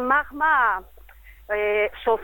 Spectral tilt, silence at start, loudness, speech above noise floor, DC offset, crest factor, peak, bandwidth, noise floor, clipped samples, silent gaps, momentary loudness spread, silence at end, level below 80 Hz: -5 dB/octave; 0 s; -22 LUFS; 25 dB; under 0.1%; 16 dB; -6 dBFS; 17.5 kHz; -47 dBFS; under 0.1%; none; 9 LU; 0 s; -50 dBFS